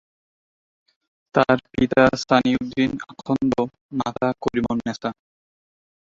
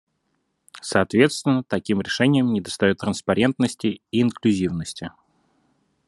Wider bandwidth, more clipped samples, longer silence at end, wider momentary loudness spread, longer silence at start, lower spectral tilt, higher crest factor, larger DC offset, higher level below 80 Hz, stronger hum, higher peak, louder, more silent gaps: second, 7.6 kHz vs 12 kHz; neither; about the same, 1 s vs 1 s; about the same, 11 LU vs 10 LU; first, 1.35 s vs 0.75 s; about the same, -6 dB/octave vs -5.5 dB/octave; about the same, 22 dB vs 22 dB; neither; first, -50 dBFS vs -60 dBFS; neither; about the same, -2 dBFS vs -2 dBFS; about the same, -22 LUFS vs -21 LUFS; first, 3.81-3.89 s vs none